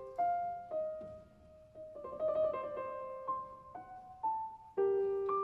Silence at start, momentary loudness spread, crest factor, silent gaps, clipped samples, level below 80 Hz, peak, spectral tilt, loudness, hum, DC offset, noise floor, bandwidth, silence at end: 0 s; 17 LU; 14 dB; none; under 0.1%; -70 dBFS; -24 dBFS; -8 dB/octave; -38 LUFS; none; under 0.1%; -60 dBFS; 4.5 kHz; 0 s